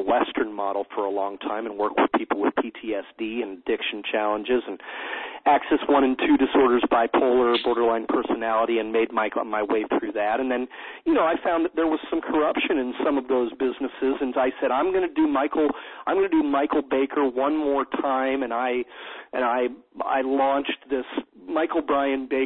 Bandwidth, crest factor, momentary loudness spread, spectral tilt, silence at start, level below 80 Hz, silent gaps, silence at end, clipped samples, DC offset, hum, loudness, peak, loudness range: 4.4 kHz; 16 dB; 9 LU; -8.5 dB/octave; 0 s; -58 dBFS; none; 0 s; under 0.1%; under 0.1%; none; -24 LUFS; -8 dBFS; 5 LU